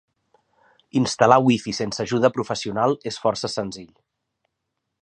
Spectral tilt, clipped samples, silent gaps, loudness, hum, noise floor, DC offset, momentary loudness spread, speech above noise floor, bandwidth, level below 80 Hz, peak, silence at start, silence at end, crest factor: -5 dB/octave; under 0.1%; none; -21 LUFS; none; -79 dBFS; under 0.1%; 11 LU; 58 dB; 9.8 kHz; -60 dBFS; 0 dBFS; 0.95 s; 1.2 s; 22 dB